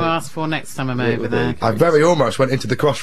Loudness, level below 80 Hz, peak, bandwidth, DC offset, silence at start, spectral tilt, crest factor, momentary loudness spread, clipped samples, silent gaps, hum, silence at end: -18 LUFS; -48 dBFS; -2 dBFS; 14 kHz; 3%; 0 s; -6 dB/octave; 16 dB; 9 LU; under 0.1%; none; none; 0 s